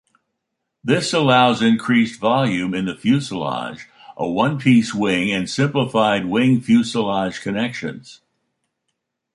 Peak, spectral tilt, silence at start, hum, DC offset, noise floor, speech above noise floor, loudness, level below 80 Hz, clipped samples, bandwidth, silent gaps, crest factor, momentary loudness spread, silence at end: -2 dBFS; -5.5 dB/octave; 0.85 s; none; under 0.1%; -77 dBFS; 59 dB; -18 LUFS; -56 dBFS; under 0.1%; 11.5 kHz; none; 18 dB; 12 LU; 1.2 s